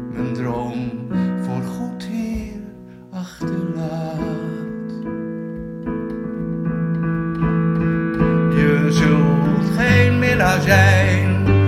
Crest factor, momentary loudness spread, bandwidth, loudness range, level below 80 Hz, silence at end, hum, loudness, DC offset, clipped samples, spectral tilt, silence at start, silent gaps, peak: 18 dB; 14 LU; 14 kHz; 11 LU; -38 dBFS; 0 s; none; -19 LUFS; under 0.1%; under 0.1%; -7 dB/octave; 0 s; none; 0 dBFS